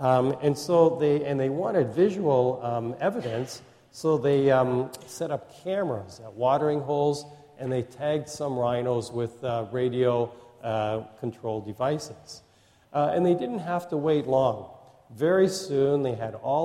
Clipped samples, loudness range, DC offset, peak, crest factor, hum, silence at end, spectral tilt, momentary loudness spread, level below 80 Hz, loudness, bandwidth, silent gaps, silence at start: under 0.1%; 4 LU; under 0.1%; -8 dBFS; 18 dB; none; 0 s; -6.5 dB/octave; 12 LU; -64 dBFS; -26 LUFS; 15 kHz; none; 0 s